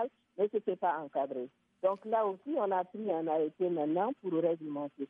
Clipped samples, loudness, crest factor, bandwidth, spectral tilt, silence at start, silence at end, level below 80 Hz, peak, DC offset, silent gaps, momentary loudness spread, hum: under 0.1%; -34 LUFS; 16 dB; 3.8 kHz; -9.5 dB/octave; 0 s; 0.05 s; -90 dBFS; -18 dBFS; under 0.1%; none; 6 LU; none